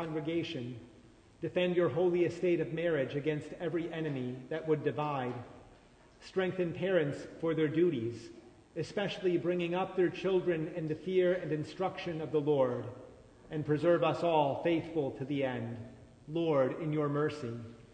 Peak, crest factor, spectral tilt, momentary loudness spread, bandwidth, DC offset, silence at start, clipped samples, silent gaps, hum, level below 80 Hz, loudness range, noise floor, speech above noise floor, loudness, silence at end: -16 dBFS; 18 dB; -7.5 dB/octave; 12 LU; 9.2 kHz; under 0.1%; 0 s; under 0.1%; none; none; -66 dBFS; 3 LU; -60 dBFS; 27 dB; -33 LUFS; 0.05 s